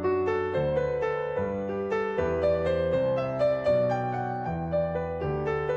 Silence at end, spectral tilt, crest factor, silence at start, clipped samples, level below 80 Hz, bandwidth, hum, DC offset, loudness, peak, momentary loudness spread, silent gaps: 0 s; -8 dB/octave; 12 dB; 0 s; under 0.1%; -50 dBFS; 7.8 kHz; none; under 0.1%; -28 LUFS; -14 dBFS; 5 LU; none